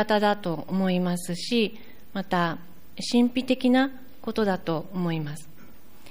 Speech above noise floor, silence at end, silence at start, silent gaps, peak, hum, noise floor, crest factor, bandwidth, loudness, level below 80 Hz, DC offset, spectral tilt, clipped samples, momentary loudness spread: 27 dB; 0.45 s; 0 s; none; -10 dBFS; none; -52 dBFS; 16 dB; 15.5 kHz; -26 LUFS; -60 dBFS; 1%; -5.5 dB/octave; under 0.1%; 14 LU